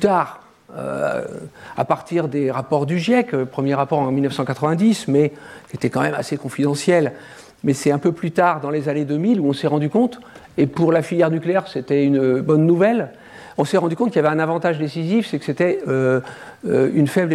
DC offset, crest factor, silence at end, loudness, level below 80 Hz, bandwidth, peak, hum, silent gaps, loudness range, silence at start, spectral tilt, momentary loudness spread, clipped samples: under 0.1%; 16 dB; 0 s; -19 LUFS; -60 dBFS; 14 kHz; -4 dBFS; none; none; 3 LU; 0 s; -7 dB/octave; 10 LU; under 0.1%